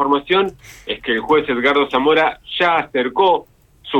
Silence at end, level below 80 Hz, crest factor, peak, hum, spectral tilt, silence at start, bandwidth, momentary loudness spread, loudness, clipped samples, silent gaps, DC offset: 0 s; -50 dBFS; 14 dB; -2 dBFS; none; -5 dB/octave; 0 s; 12.5 kHz; 8 LU; -17 LUFS; under 0.1%; none; under 0.1%